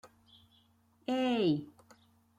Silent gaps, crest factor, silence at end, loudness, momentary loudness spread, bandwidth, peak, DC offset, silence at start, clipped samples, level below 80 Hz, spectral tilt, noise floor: none; 16 dB; 0.75 s; -33 LUFS; 17 LU; 12 kHz; -20 dBFS; under 0.1%; 0.05 s; under 0.1%; -76 dBFS; -6.5 dB/octave; -68 dBFS